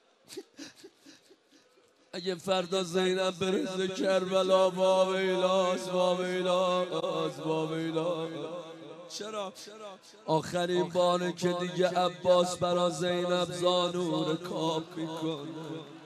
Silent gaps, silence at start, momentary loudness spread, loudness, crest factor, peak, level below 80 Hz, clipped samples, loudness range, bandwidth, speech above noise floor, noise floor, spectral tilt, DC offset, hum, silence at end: none; 0.3 s; 17 LU; -29 LUFS; 18 dB; -12 dBFS; -76 dBFS; under 0.1%; 7 LU; 13 kHz; 35 dB; -64 dBFS; -5 dB/octave; under 0.1%; none; 0 s